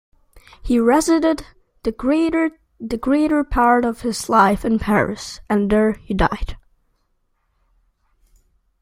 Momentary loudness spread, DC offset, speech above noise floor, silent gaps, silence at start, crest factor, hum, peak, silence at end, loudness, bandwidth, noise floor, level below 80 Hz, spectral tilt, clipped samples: 12 LU; under 0.1%; 49 dB; none; 0.35 s; 18 dB; none; -2 dBFS; 2.25 s; -18 LUFS; 16 kHz; -67 dBFS; -36 dBFS; -5.5 dB/octave; under 0.1%